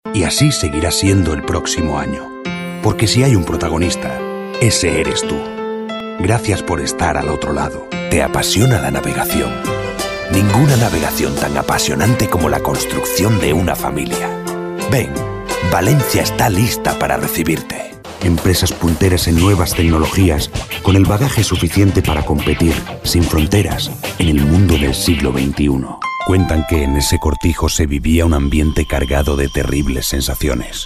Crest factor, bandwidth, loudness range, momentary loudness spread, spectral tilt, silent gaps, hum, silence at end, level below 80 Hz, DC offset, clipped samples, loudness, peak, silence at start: 14 dB; 15.5 kHz; 3 LU; 8 LU; -5 dB/octave; none; none; 0 s; -26 dBFS; under 0.1%; under 0.1%; -15 LUFS; -2 dBFS; 0.05 s